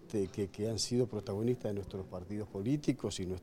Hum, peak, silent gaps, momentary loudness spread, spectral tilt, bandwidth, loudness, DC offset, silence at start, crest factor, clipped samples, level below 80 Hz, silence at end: none; -18 dBFS; none; 9 LU; -5.5 dB/octave; 16.5 kHz; -36 LUFS; under 0.1%; 0 s; 18 dB; under 0.1%; -60 dBFS; 0 s